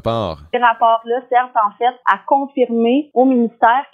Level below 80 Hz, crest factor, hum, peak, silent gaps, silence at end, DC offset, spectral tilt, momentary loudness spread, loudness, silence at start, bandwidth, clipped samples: -50 dBFS; 16 dB; none; 0 dBFS; none; 0.1 s; under 0.1%; -7.5 dB/octave; 4 LU; -16 LUFS; 0.05 s; 6.2 kHz; under 0.1%